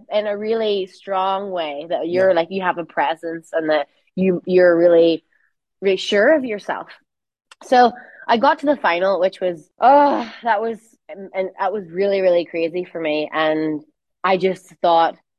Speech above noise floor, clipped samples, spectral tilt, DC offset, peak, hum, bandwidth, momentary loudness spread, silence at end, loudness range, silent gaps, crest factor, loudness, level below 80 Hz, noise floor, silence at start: 47 dB; under 0.1%; -6 dB/octave; under 0.1%; -2 dBFS; none; 10 kHz; 11 LU; 0.25 s; 4 LU; none; 18 dB; -19 LUFS; -68 dBFS; -65 dBFS; 0.1 s